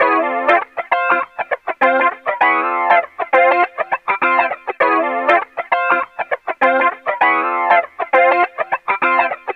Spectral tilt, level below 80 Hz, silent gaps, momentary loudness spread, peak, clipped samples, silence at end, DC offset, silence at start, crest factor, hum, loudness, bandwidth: -5 dB/octave; -68 dBFS; none; 6 LU; -2 dBFS; under 0.1%; 0 s; under 0.1%; 0 s; 14 dB; none; -16 LUFS; 6 kHz